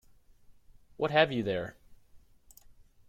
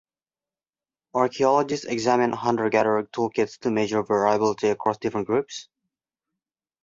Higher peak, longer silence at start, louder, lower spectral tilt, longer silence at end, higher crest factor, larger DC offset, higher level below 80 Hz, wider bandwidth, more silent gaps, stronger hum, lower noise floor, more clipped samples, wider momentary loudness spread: second, -10 dBFS vs -6 dBFS; second, 0.5 s vs 1.15 s; second, -29 LUFS vs -23 LUFS; about the same, -6 dB/octave vs -5 dB/octave; second, 0.4 s vs 1.2 s; first, 26 dB vs 18 dB; neither; about the same, -62 dBFS vs -64 dBFS; first, 16 kHz vs 7.8 kHz; neither; neither; second, -58 dBFS vs under -90 dBFS; neither; first, 11 LU vs 6 LU